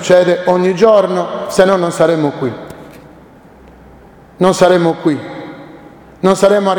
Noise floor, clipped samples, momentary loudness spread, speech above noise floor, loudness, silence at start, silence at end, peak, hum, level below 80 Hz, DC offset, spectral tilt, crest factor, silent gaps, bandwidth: -40 dBFS; 0.1%; 20 LU; 29 dB; -12 LUFS; 0 s; 0 s; 0 dBFS; none; -48 dBFS; under 0.1%; -5.5 dB/octave; 14 dB; none; 18.5 kHz